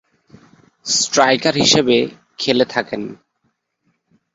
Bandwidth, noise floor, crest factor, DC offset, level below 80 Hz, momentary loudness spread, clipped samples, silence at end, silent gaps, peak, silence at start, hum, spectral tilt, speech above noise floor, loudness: 8 kHz; -68 dBFS; 20 dB; under 0.1%; -56 dBFS; 14 LU; under 0.1%; 1.2 s; none; 0 dBFS; 0.85 s; none; -2.5 dB/octave; 52 dB; -16 LUFS